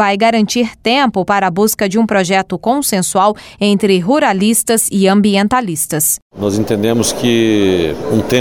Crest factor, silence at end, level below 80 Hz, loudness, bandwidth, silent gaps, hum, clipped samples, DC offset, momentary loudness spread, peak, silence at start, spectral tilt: 12 dB; 0 s; -44 dBFS; -13 LUFS; 17 kHz; 6.22-6.30 s; none; under 0.1%; under 0.1%; 4 LU; -2 dBFS; 0 s; -4 dB/octave